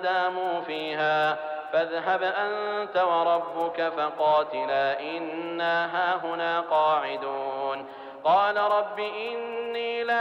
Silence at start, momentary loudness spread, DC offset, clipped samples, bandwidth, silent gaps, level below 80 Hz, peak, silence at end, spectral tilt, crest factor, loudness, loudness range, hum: 0 s; 8 LU; under 0.1%; under 0.1%; 7.6 kHz; none; -74 dBFS; -12 dBFS; 0 s; -5 dB/octave; 14 dB; -26 LUFS; 1 LU; none